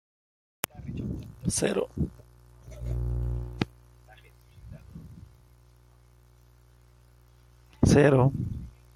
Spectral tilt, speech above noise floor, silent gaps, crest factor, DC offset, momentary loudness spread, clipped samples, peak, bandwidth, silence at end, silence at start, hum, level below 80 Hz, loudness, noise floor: -6 dB/octave; 34 dB; none; 28 dB; under 0.1%; 26 LU; under 0.1%; -2 dBFS; 16.5 kHz; 0.25 s; 0.75 s; 60 Hz at -45 dBFS; -42 dBFS; -28 LUFS; -57 dBFS